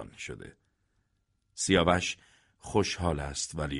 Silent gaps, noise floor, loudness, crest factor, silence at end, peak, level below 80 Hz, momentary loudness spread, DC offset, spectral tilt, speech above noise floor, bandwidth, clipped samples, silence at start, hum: none; -75 dBFS; -29 LUFS; 22 dB; 0 s; -10 dBFS; -48 dBFS; 20 LU; under 0.1%; -4 dB/octave; 45 dB; 11.5 kHz; under 0.1%; 0 s; none